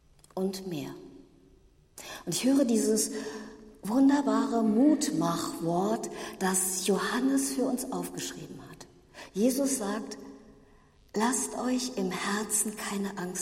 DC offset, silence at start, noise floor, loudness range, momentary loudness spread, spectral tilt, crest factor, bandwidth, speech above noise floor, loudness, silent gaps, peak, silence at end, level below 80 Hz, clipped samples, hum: under 0.1%; 0.35 s; -60 dBFS; 6 LU; 18 LU; -4 dB/octave; 18 dB; 16 kHz; 31 dB; -29 LUFS; none; -12 dBFS; 0 s; -64 dBFS; under 0.1%; none